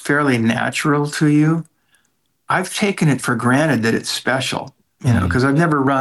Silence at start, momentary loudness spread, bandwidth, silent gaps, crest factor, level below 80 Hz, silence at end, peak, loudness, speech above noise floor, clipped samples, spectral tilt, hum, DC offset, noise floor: 0 s; 6 LU; 12.5 kHz; none; 12 dB; -50 dBFS; 0 s; -6 dBFS; -17 LUFS; 50 dB; under 0.1%; -5.5 dB/octave; none; under 0.1%; -66 dBFS